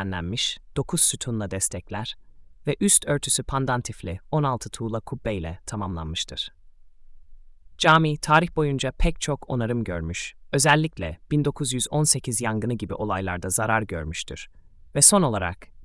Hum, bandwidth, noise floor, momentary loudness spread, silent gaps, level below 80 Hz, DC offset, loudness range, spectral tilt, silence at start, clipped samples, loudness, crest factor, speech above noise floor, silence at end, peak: none; 12 kHz; -47 dBFS; 14 LU; none; -40 dBFS; under 0.1%; 6 LU; -3.5 dB/octave; 0 s; under 0.1%; -23 LUFS; 24 dB; 23 dB; 0 s; 0 dBFS